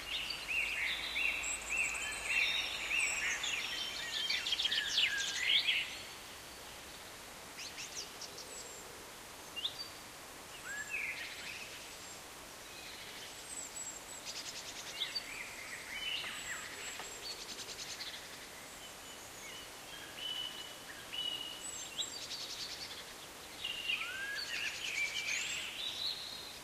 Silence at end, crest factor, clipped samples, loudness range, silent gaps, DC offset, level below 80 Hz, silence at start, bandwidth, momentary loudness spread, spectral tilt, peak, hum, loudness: 0 s; 22 dB; under 0.1%; 11 LU; none; under 0.1%; -66 dBFS; 0 s; 15.5 kHz; 16 LU; 0.5 dB/octave; -20 dBFS; none; -38 LUFS